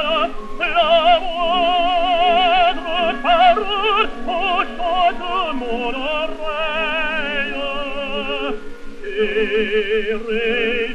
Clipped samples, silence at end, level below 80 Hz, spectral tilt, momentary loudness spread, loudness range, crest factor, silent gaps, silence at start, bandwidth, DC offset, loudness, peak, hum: under 0.1%; 0 s; -34 dBFS; -4 dB/octave; 10 LU; 6 LU; 16 dB; none; 0 s; 9.2 kHz; under 0.1%; -18 LUFS; -2 dBFS; none